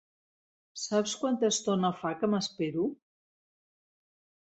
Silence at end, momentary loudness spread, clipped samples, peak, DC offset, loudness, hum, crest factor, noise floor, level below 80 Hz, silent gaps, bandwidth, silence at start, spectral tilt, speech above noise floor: 1.55 s; 7 LU; under 0.1%; -14 dBFS; under 0.1%; -30 LUFS; none; 18 dB; under -90 dBFS; -74 dBFS; none; 8.2 kHz; 0.75 s; -4.5 dB/octave; over 60 dB